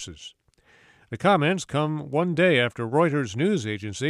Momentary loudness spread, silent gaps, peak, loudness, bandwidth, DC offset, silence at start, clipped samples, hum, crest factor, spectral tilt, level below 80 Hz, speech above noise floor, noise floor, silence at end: 17 LU; none; -6 dBFS; -23 LUFS; 12 kHz; under 0.1%; 0 s; under 0.1%; none; 18 dB; -5.5 dB/octave; -60 dBFS; 35 dB; -58 dBFS; 0 s